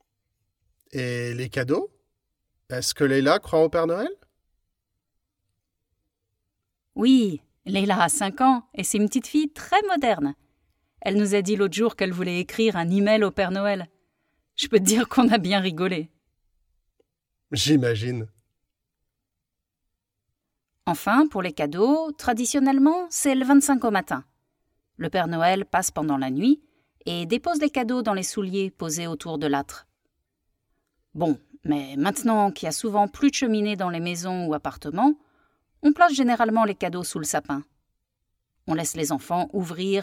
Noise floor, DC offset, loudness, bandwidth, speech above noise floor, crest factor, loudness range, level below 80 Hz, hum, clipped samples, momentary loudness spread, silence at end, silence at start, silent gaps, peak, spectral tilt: -83 dBFS; under 0.1%; -23 LUFS; 17 kHz; 60 dB; 20 dB; 6 LU; -58 dBFS; none; under 0.1%; 11 LU; 0 s; 0.95 s; none; -4 dBFS; -4.5 dB/octave